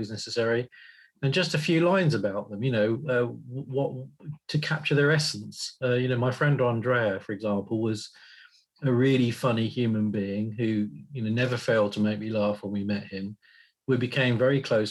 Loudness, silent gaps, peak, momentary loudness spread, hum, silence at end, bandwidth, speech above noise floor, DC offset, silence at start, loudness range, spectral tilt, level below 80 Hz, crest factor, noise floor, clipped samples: -27 LUFS; none; -12 dBFS; 11 LU; none; 0 s; 12.5 kHz; 29 dB; under 0.1%; 0 s; 2 LU; -6 dB/octave; -70 dBFS; 14 dB; -55 dBFS; under 0.1%